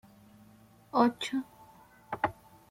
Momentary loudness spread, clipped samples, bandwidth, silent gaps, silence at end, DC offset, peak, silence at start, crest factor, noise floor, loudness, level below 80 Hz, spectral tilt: 14 LU; under 0.1%; 16 kHz; none; 0.4 s; under 0.1%; -12 dBFS; 0.95 s; 24 dB; -59 dBFS; -32 LUFS; -68 dBFS; -5 dB/octave